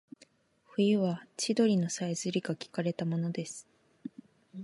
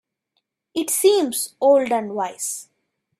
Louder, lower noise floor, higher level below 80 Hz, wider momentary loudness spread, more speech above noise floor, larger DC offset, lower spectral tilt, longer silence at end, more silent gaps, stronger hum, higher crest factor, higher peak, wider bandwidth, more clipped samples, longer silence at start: second, -32 LUFS vs -20 LUFS; second, -65 dBFS vs -74 dBFS; second, -80 dBFS vs -70 dBFS; first, 20 LU vs 11 LU; second, 35 dB vs 55 dB; neither; first, -5.5 dB/octave vs -2.5 dB/octave; second, 0 s vs 0.55 s; neither; neither; about the same, 18 dB vs 18 dB; second, -14 dBFS vs -4 dBFS; second, 11.5 kHz vs 15.5 kHz; neither; about the same, 0.8 s vs 0.75 s